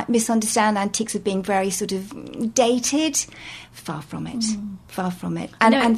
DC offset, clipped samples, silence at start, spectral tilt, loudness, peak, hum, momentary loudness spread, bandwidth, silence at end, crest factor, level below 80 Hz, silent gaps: under 0.1%; under 0.1%; 0 s; -3.5 dB/octave; -22 LUFS; -2 dBFS; none; 14 LU; 14 kHz; 0 s; 20 dB; -56 dBFS; none